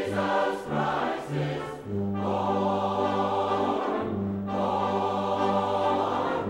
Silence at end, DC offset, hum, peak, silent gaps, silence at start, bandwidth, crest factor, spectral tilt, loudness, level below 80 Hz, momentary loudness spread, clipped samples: 0 s; under 0.1%; none; -12 dBFS; none; 0 s; 16 kHz; 16 dB; -7 dB/octave; -27 LUFS; -60 dBFS; 5 LU; under 0.1%